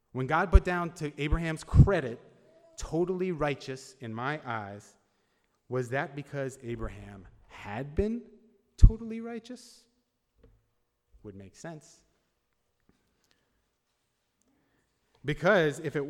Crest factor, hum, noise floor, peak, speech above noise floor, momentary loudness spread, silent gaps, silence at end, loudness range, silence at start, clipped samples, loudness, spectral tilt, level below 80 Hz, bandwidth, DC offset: 28 dB; none; -78 dBFS; -2 dBFS; 50 dB; 22 LU; none; 0 s; 23 LU; 0.15 s; under 0.1%; -30 LUFS; -7 dB/octave; -34 dBFS; 11.5 kHz; under 0.1%